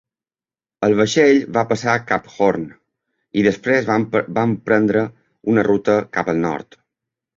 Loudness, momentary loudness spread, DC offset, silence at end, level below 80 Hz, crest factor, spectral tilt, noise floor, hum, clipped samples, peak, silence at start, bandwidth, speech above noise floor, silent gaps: -18 LUFS; 10 LU; under 0.1%; 0.75 s; -54 dBFS; 18 dB; -6 dB/octave; under -90 dBFS; none; under 0.1%; -2 dBFS; 0.8 s; 7.6 kHz; over 73 dB; none